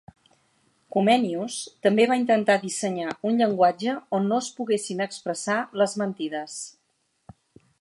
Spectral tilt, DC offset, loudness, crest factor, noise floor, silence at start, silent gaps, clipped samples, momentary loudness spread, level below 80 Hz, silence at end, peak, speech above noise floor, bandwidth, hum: -4.5 dB/octave; under 0.1%; -24 LUFS; 20 dB; -72 dBFS; 0.95 s; none; under 0.1%; 10 LU; -72 dBFS; 1.1 s; -6 dBFS; 48 dB; 11.5 kHz; none